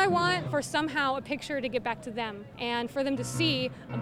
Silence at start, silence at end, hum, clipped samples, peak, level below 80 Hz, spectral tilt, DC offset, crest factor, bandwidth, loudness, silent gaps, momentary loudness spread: 0 s; 0 s; none; under 0.1%; -12 dBFS; -60 dBFS; -4.5 dB/octave; under 0.1%; 18 dB; 16 kHz; -30 LUFS; none; 8 LU